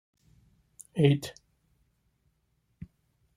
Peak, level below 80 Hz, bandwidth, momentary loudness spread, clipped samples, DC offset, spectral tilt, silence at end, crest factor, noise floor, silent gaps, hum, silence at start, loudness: -8 dBFS; -66 dBFS; 14.5 kHz; 26 LU; under 0.1%; under 0.1%; -7 dB/octave; 2.05 s; 26 dB; -74 dBFS; none; none; 0.95 s; -27 LUFS